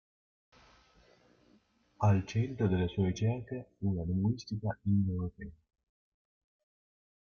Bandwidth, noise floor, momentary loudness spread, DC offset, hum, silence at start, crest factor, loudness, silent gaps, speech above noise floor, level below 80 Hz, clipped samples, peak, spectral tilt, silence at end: 7 kHz; -68 dBFS; 10 LU; under 0.1%; none; 2 s; 18 dB; -33 LUFS; none; 37 dB; -60 dBFS; under 0.1%; -16 dBFS; -8 dB/octave; 1.8 s